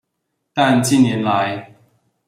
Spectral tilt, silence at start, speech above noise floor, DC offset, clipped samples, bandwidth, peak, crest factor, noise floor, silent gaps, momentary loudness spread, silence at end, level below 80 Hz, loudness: -5 dB/octave; 0.55 s; 59 dB; under 0.1%; under 0.1%; 15 kHz; -2 dBFS; 16 dB; -74 dBFS; none; 12 LU; 0.65 s; -58 dBFS; -16 LUFS